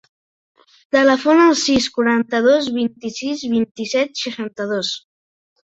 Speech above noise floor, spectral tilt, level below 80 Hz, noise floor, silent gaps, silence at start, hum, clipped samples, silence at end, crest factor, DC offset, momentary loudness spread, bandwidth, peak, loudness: over 73 dB; -3.5 dB/octave; -54 dBFS; under -90 dBFS; 3.71-3.75 s; 0.95 s; none; under 0.1%; 0.7 s; 18 dB; under 0.1%; 12 LU; 8.2 kHz; 0 dBFS; -17 LUFS